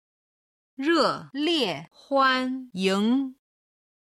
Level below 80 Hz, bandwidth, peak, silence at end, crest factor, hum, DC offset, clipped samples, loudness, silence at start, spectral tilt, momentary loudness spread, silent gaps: -72 dBFS; 13.5 kHz; -10 dBFS; 0.85 s; 16 dB; none; under 0.1%; under 0.1%; -25 LUFS; 0.8 s; -4.5 dB/octave; 9 LU; none